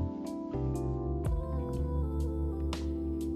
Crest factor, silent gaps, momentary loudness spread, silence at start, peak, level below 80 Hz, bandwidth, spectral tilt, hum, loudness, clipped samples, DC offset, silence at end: 10 dB; none; 2 LU; 0 s; -22 dBFS; -36 dBFS; 12.5 kHz; -8.5 dB/octave; none; -35 LUFS; under 0.1%; under 0.1%; 0 s